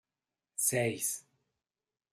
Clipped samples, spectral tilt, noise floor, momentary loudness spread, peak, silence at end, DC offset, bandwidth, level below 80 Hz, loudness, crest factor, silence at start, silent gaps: under 0.1%; -3 dB/octave; under -90 dBFS; 13 LU; -16 dBFS; 0.9 s; under 0.1%; 15.5 kHz; -78 dBFS; -32 LUFS; 22 dB; 0.6 s; none